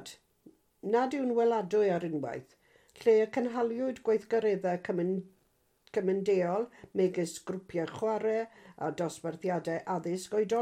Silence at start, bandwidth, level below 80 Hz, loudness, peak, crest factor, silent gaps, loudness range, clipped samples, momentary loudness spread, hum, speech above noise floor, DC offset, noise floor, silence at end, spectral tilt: 0 s; 14 kHz; -74 dBFS; -31 LUFS; -16 dBFS; 16 dB; none; 4 LU; under 0.1%; 9 LU; none; 41 dB; under 0.1%; -72 dBFS; 0 s; -6 dB/octave